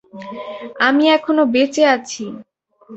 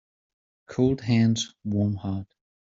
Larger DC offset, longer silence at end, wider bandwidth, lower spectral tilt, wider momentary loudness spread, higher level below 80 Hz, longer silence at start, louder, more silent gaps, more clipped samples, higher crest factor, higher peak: neither; second, 0 s vs 0.5 s; about the same, 8.2 kHz vs 7.8 kHz; second, -3 dB/octave vs -7 dB/octave; first, 17 LU vs 12 LU; second, -64 dBFS vs -58 dBFS; second, 0.15 s vs 0.7 s; first, -15 LUFS vs -26 LUFS; neither; neither; about the same, 16 dB vs 18 dB; first, 0 dBFS vs -10 dBFS